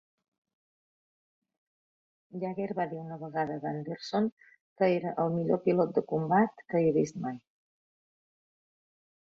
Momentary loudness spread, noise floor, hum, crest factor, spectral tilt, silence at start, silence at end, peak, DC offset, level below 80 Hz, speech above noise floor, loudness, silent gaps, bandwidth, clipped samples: 11 LU; under -90 dBFS; none; 20 dB; -7.5 dB/octave; 2.35 s; 2 s; -12 dBFS; under 0.1%; -74 dBFS; over 60 dB; -30 LUFS; 4.32-4.37 s, 4.61-4.76 s; 7.8 kHz; under 0.1%